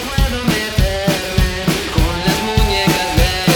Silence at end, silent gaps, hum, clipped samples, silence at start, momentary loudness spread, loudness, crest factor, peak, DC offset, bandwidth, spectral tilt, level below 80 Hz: 0 s; none; none; under 0.1%; 0 s; 3 LU; -16 LUFS; 14 dB; -2 dBFS; under 0.1%; over 20 kHz; -4.5 dB/octave; -20 dBFS